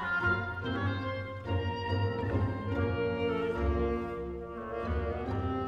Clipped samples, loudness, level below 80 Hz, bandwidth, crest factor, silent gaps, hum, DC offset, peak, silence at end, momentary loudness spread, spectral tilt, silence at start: under 0.1%; -33 LUFS; -42 dBFS; 6.4 kHz; 14 dB; none; none; under 0.1%; -18 dBFS; 0 s; 7 LU; -8.5 dB/octave; 0 s